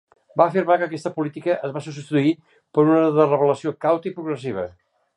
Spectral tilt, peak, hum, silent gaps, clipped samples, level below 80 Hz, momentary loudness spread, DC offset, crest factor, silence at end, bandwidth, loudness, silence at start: -7.5 dB/octave; -2 dBFS; none; none; under 0.1%; -64 dBFS; 13 LU; under 0.1%; 20 dB; 0.45 s; 10.5 kHz; -21 LUFS; 0.35 s